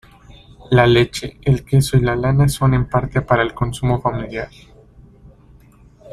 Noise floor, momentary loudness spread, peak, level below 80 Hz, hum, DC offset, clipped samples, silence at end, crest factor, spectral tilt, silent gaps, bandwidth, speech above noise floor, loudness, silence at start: -47 dBFS; 9 LU; -2 dBFS; -36 dBFS; none; under 0.1%; under 0.1%; 0.05 s; 16 dB; -6.5 dB/octave; none; 14 kHz; 31 dB; -17 LUFS; 0.7 s